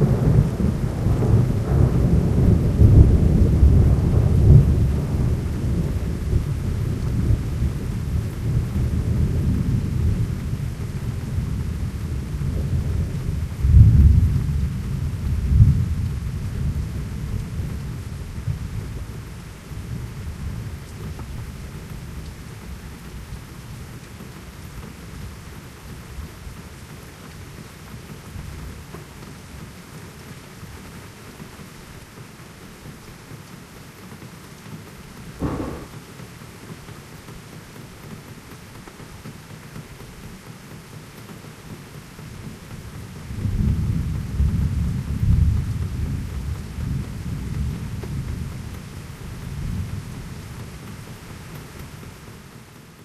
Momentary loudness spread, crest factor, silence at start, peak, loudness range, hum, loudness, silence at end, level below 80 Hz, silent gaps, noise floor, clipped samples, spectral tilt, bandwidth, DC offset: 22 LU; 22 dB; 0 s; 0 dBFS; 21 LU; none; -22 LUFS; 0.1 s; -28 dBFS; none; -43 dBFS; under 0.1%; -8 dB/octave; 14 kHz; under 0.1%